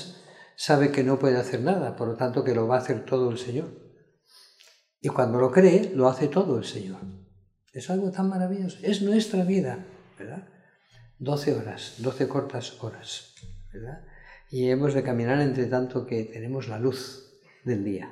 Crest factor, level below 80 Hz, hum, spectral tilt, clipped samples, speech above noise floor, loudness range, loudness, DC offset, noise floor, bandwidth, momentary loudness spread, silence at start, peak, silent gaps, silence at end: 22 dB; -58 dBFS; none; -6.5 dB/octave; under 0.1%; 35 dB; 8 LU; -26 LUFS; under 0.1%; -60 dBFS; 13 kHz; 19 LU; 0 s; -6 dBFS; none; 0 s